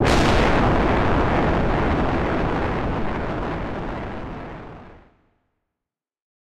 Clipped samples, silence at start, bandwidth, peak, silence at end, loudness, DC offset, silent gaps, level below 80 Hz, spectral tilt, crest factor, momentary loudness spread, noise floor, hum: under 0.1%; 0 s; 13 kHz; -8 dBFS; 0.25 s; -22 LUFS; 1%; none; -30 dBFS; -6.5 dB/octave; 14 dB; 15 LU; -87 dBFS; none